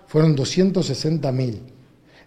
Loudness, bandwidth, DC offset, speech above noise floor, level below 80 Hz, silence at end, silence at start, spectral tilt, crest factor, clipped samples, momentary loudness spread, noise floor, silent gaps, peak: -20 LUFS; 10.5 kHz; under 0.1%; 31 dB; -52 dBFS; 0.6 s; 0.1 s; -6.5 dB/octave; 16 dB; under 0.1%; 8 LU; -50 dBFS; none; -4 dBFS